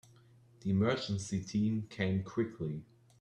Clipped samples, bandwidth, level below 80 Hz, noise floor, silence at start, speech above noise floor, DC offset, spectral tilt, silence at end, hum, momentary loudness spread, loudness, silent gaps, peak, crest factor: under 0.1%; 10.5 kHz; -66 dBFS; -62 dBFS; 0.6 s; 28 dB; under 0.1%; -6.5 dB/octave; 0.35 s; none; 10 LU; -35 LUFS; none; -18 dBFS; 18 dB